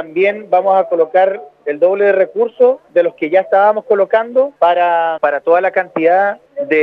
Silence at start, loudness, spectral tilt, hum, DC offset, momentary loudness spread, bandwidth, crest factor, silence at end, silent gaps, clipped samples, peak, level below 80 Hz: 0 s; -13 LUFS; -7 dB/octave; none; under 0.1%; 4 LU; 4.7 kHz; 12 dB; 0 s; none; under 0.1%; 0 dBFS; -74 dBFS